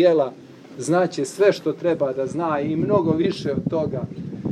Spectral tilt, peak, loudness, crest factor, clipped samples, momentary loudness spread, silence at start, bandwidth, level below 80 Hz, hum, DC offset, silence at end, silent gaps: -6.5 dB/octave; -6 dBFS; -22 LUFS; 16 dB; under 0.1%; 11 LU; 0 s; 13 kHz; -56 dBFS; none; under 0.1%; 0 s; none